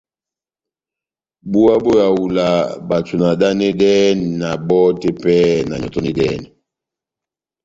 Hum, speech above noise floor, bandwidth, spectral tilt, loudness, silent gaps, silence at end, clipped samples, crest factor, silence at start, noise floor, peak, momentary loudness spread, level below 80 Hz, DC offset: none; 75 dB; 7.8 kHz; -6.5 dB/octave; -15 LUFS; none; 1.2 s; under 0.1%; 14 dB; 1.45 s; -89 dBFS; -2 dBFS; 8 LU; -48 dBFS; under 0.1%